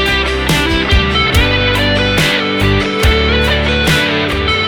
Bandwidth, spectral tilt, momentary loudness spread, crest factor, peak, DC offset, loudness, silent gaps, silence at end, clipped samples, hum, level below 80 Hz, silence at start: 18 kHz; -4.5 dB/octave; 2 LU; 12 dB; 0 dBFS; under 0.1%; -12 LUFS; none; 0 s; under 0.1%; none; -20 dBFS; 0 s